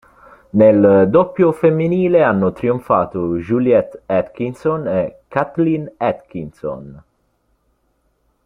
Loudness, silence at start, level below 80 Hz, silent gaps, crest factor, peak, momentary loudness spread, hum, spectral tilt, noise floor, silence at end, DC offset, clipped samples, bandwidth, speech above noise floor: -16 LUFS; 0.55 s; -52 dBFS; none; 16 dB; -2 dBFS; 14 LU; none; -9.5 dB/octave; -64 dBFS; 1.45 s; under 0.1%; under 0.1%; 10 kHz; 48 dB